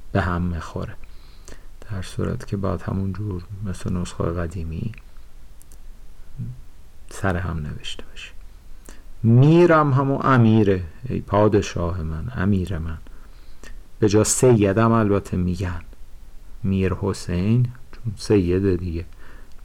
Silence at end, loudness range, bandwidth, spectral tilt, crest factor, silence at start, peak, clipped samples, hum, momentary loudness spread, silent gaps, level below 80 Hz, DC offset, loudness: 0 s; 14 LU; 15 kHz; -6.5 dB/octave; 14 dB; 0 s; -8 dBFS; under 0.1%; none; 18 LU; none; -38 dBFS; under 0.1%; -21 LUFS